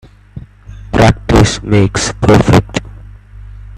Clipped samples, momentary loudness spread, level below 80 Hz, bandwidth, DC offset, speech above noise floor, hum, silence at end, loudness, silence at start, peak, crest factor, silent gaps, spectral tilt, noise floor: under 0.1%; 9 LU; -24 dBFS; 14 kHz; under 0.1%; 23 dB; 50 Hz at -25 dBFS; 0 s; -11 LUFS; 0.35 s; 0 dBFS; 12 dB; none; -5.5 dB/octave; -32 dBFS